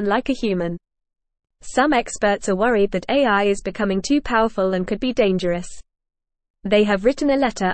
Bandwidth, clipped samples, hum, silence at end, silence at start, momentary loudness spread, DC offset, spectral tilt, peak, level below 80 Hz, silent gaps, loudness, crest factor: 8.8 kHz; under 0.1%; none; 0 s; 0 s; 7 LU; under 0.1%; -5 dB/octave; -4 dBFS; -42 dBFS; 6.50-6.54 s; -20 LUFS; 16 dB